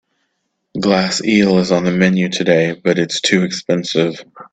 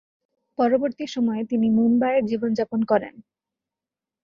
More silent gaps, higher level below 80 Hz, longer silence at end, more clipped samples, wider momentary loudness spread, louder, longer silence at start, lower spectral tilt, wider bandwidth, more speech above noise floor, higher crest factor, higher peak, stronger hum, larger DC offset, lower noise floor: neither; first, -54 dBFS vs -64 dBFS; second, 0.1 s vs 1.05 s; neither; about the same, 6 LU vs 7 LU; first, -15 LUFS vs -22 LUFS; first, 0.75 s vs 0.6 s; second, -5 dB/octave vs -7 dB/octave; first, 9 kHz vs 7 kHz; second, 55 dB vs 67 dB; about the same, 16 dB vs 16 dB; first, 0 dBFS vs -6 dBFS; neither; neither; second, -70 dBFS vs -89 dBFS